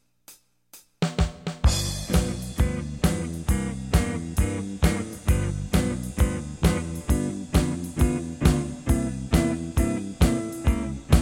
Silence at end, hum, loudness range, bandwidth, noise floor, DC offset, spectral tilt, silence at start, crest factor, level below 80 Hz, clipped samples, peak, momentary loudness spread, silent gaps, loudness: 0 s; none; 2 LU; 16.5 kHz; -53 dBFS; under 0.1%; -5.5 dB/octave; 0.3 s; 20 dB; -28 dBFS; under 0.1%; -4 dBFS; 5 LU; none; -26 LUFS